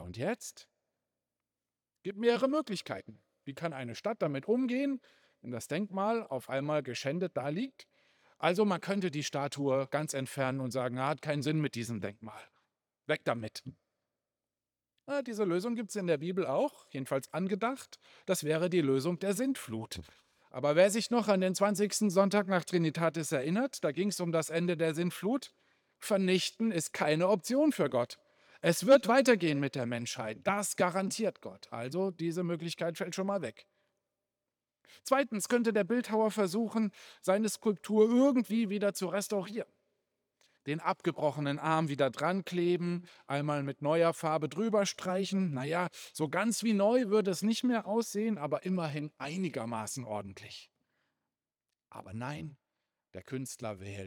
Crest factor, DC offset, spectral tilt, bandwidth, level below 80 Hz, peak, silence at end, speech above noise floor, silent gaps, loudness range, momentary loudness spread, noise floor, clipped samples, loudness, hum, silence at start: 22 dB; under 0.1%; -5 dB/octave; over 20 kHz; -80 dBFS; -10 dBFS; 0 s; over 58 dB; none; 8 LU; 14 LU; under -90 dBFS; under 0.1%; -32 LUFS; none; 0 s